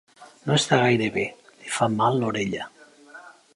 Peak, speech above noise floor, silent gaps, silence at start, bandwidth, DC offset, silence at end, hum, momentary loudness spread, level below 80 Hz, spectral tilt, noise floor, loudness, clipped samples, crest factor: -4 dBFS; 25 dB; none; 0.2 s; 11.5 kHz; under 0.1%; 0.25 s; none; 15 LU; -62 dBFS; -4.5 dB/octave; -47 dBFS; -23 LUFS; under 0.1%; 22 dB